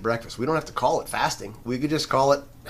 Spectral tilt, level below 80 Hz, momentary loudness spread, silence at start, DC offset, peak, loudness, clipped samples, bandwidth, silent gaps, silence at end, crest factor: -4.5 dB/octave; -50 dBFS; 7 LU; 0 s; under 0.1%; -6 dBFS; -25 LUFS; under 0.1%; 15.5 kHz; none; 0 s; 18 dB